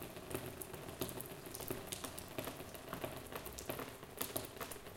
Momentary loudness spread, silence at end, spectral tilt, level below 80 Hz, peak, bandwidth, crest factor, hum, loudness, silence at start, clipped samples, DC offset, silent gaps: 5 LU; 0 s; -3.5 dB/octave; -62 dBFS; -18 dBFS; 17 kHz; 28 dB; none; -46 LUFS; 0 s; under 0.1%; under 0.1%; none